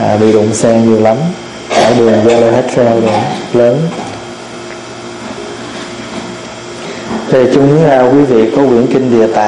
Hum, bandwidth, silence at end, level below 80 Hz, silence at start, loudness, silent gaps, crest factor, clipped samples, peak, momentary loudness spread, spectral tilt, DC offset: none; 11 kHz; 0 s; -44 dBFS; 0 s; -9 LUFS; none; 10 dB; under 0.1%; 0 dBFS; 17 LU; -6 dB/octave; under 0.1%